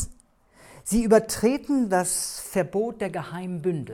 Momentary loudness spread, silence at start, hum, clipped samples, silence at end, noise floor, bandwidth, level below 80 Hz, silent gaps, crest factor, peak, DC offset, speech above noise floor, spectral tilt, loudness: 13 LU; 0 s; none; under 0.1%; 0 s; -57 dBFS; 18 kHz; -46 dBFS; none; 20 dB; -6 dBFS; under 0.1%; 33 dB; -4.5 dB/octave; -25 LUFS